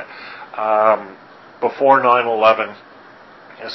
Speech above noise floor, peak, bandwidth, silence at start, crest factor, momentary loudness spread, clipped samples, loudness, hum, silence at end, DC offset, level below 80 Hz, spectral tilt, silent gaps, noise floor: 27 dB; 0 dBFS; 6 kHz; 0 s; 18 dB; 20 LU; under 0.1%; -16 LUFS; none; 0 s; under 0.1%; -68 dBFS; -6 dB/octave; none; -43 dBFS